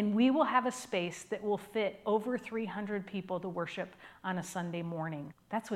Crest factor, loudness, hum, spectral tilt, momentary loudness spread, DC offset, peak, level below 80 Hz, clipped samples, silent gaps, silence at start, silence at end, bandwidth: 20 dB; -35 LUFS; none; -5.5 dB/octave; 11 LU; under 0.1%; -14 dBFS; -76 dBFS; under 0.1%; none; 0 s; 0 s; 15 kHz